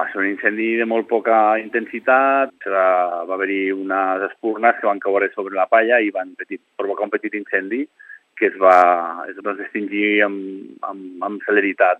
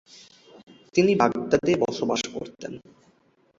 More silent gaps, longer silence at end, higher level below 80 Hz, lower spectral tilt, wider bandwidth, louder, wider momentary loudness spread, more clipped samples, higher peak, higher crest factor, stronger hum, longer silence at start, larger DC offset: neither; second, 0 s vs 0.8 s; second, -82 dBFS vs -60 dBFS; first, -6.5 dB/octave vs -5 dB/octave; second, 6.8 kHz vs 7.8 kHz; first, -18 LUFS vs -24 LUFS; second, 13 LU vs 18 LU; neither; first, 0 dBFS vs -4 dBFS; about the same, 18 dB vs 22 dB; neither; second, 0 s vs 0.95 s; neither